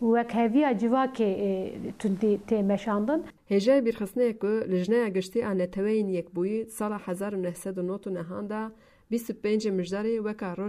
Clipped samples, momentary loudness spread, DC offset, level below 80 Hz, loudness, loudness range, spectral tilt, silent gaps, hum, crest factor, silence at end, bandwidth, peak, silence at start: under 0.1%; 9 LU; under 0.1%; -62 dBFS; -28 LUFS; 6 LU; -7 dB/octave; none; none; 16 dB; 0 s; 15.5 kHz; -10 dBFS; 0 s